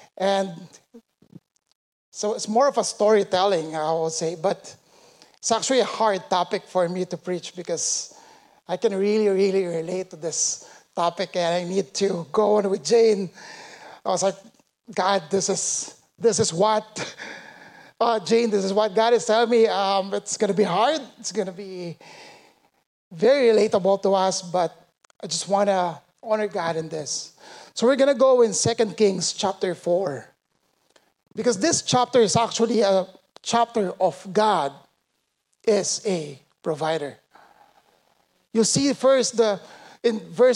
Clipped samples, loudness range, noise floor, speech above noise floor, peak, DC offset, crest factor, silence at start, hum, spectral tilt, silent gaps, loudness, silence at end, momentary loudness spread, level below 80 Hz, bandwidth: under 0.1%; 4 LU; -75 dBFS; 53 dB; -8 dBFS; under 0.1%; 16 dB; 0.2 s; none; -3.5 dB/octave; 1.75-2.12 s, 22.86-23.11 s; -22 LUFS; 0 s; 14 LU; -70 dBFS; 11.5 kHz